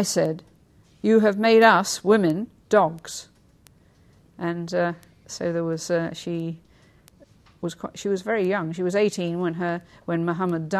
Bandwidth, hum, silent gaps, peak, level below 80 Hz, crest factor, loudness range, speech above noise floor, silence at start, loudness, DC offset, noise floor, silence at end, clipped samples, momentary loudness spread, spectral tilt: 14 kHz; none; none; -4 dBFS; -62 dBFS; 20 dB; 9 LU; 34 dB; 0 s; -23 LUFS; under 0.1%; -56 dBFS; 0 s; under 0.1%; 16 LU; -5 dB/octave